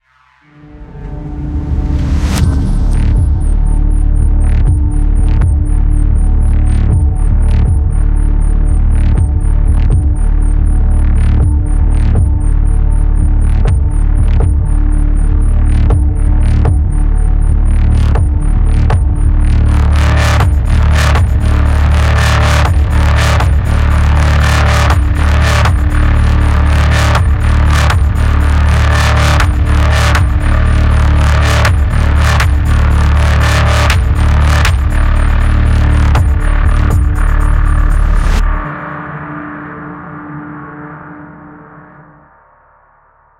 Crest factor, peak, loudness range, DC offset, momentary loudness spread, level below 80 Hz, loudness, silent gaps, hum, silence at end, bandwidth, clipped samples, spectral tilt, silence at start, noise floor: 10 dB; 0 dBFS; 5 LU; under 0.1%; 5 LU; -10 dBFS; -12 LUFS; none; none; 1.6 s; 12 kHz; under 0.1%; -6 dB/octave; 0.75 s; -48 dBFS